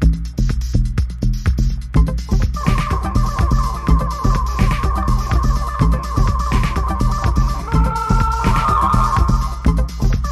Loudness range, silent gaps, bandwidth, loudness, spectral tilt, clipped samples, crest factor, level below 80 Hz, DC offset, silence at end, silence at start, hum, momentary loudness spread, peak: 2 LU; none; 13.5 kHz; -18 LUFS; -6.5 dB/octave; under 0.1%; 14 dB; -18 dBFS; under 0.1%; 0 s; 0 s; none; 4 LU; -2 dBFS